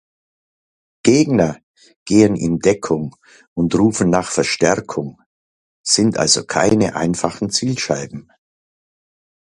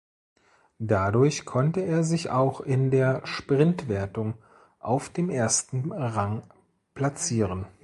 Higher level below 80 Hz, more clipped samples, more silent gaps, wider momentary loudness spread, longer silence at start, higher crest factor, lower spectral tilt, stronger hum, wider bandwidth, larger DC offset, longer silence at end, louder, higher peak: about the same, -48 dBFS vs -52 dBFS; neither; first, 1.63-1.74 s, 1.96-2.06 s, 3.47-3.56 s, 5.26-5.84 s vs none; first, 15 LU vs 9 LU; first, 1.05 s vs 0.8 s; about the same, 18 dB vs 18 dB; about the same, -4.5 dB/octave vs -5.5 dB/octave; neither; about the same, 11.5 kHz vs 11.5 kHz; neither; first, 1.35 s vs 0.15 s; first, -17 LUFS vs -26 LUFS; first, 0 dBFS vs -8 dBFS